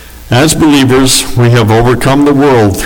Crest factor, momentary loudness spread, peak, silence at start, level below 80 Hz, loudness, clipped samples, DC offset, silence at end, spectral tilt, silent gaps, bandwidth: 6 dB; 2 LU; 0 dBFS; 0 s; -24 dBFS; -7 LUFS; under 0.1%; under 0.1%; 0 s; -5 dB/octave; none; over 20 kHz